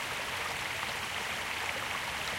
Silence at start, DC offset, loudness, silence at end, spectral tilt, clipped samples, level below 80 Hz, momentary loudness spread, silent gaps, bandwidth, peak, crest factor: 0 s; under 0.1%; -34 LUFS; 0 s; -1.5 dB/octave; under 0.1%; -58 dBFS; 1 LU; none; 16 kHz; -18 dBFS; 18 dB